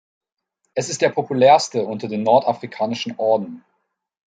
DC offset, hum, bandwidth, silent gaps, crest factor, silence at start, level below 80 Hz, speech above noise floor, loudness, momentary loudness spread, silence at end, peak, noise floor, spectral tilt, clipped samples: under 0.1%; none; 9.4 kHz; none; 18 dB; 0.75 s; -70 dBFS; 55 dB; -19 LUFS; 11 LU; 0.7 s; -2 dBFS; -73 dBFS; -4.5 dB/octave; under 0.1%